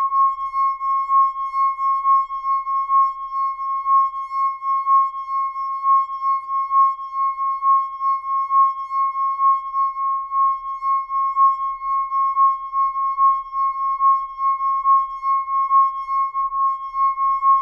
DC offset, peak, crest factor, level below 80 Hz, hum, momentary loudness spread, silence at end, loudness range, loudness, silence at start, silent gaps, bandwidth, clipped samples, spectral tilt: under 0.1%; -8 dBFS; 12 dB; -58 dBFS; none; 6 LU; 0 s; 1 LU; -19 LUFS; 0 s; none; 5.8 kHz; under 0.1%; -1 dB/octave